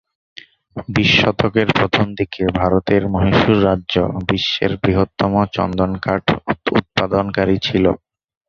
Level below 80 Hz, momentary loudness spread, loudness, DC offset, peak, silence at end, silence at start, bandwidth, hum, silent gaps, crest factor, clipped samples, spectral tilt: -36 dBFS; 6 LU; -17 LUFS; under 0.1%; 0 dBFS; 0.5 s; 0.75 s; 7.2 kHz; none; none; 16 dB; under 0.1%; -6.5 dB/octave